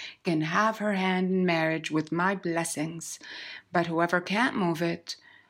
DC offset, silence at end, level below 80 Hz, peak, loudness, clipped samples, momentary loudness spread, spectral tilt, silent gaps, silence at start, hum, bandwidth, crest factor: under 0.1%; 0.35 s; -76 dBFS; -12 dBFS; -28 LUFS; under 0.1%; 12 LU; -5 dB/octave; none; 0 s; none; 16 kHz; 18 dB